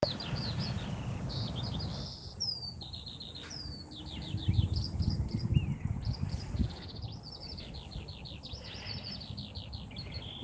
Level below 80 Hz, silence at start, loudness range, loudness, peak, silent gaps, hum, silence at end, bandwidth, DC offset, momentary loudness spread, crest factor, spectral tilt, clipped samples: -46 dBFS; 0 s; 7 LU; -38 LUFS; -12 dBFS; none; none; 0 s; 9.2 kHz; under 0.1%; 12 LU; 24 dB; -6 dB/octave; under 0.1%